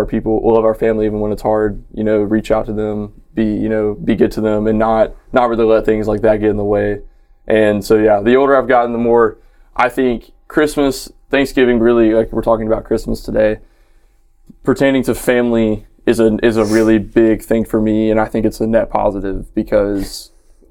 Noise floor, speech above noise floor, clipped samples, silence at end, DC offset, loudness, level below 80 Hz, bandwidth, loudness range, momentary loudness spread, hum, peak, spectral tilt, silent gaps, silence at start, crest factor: -49 dBFS; 35 dB; under 0.1%; 0.45 s; under 0.1%; -15 LUFS; -32 dBFS; 17 kHz; 3 LU; 8 LU; none; 0 dBFS; -6.5 dB/octave; none; 0 s; 14 dB